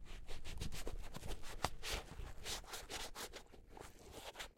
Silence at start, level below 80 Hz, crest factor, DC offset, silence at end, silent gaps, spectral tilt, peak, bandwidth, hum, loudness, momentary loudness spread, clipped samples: 0 s; -52 dBFS; 32 dB; under 0.1%; 0.05 s; none; -2.5 dB/octave; -14 dBFS; 16.5 kHz; none; -49 LUFS; 12 LU; under 0.1%